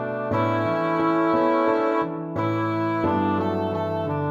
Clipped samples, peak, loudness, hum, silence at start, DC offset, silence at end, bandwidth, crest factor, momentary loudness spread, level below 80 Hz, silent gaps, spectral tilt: under 0.1%; -8 dBFS; -23 LUFS; none; 0 s; under 0.1%; 0 s; 7.4 kHz; 14 dB; 5 LU; -58 dBFS; none; -8.5 dB/octave